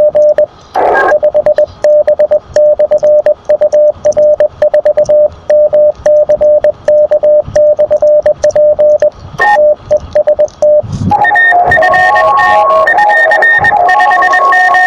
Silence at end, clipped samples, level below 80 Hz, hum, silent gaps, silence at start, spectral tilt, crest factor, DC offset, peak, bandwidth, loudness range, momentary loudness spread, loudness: 0 s; under 0.1%; -40 dBFS; none; none; 0 s; -5 dB/octave; 8 dB; under 0.1%; 0 dBFS; 7.8 kHz; 3 LU; 5 LU; -7 LUFS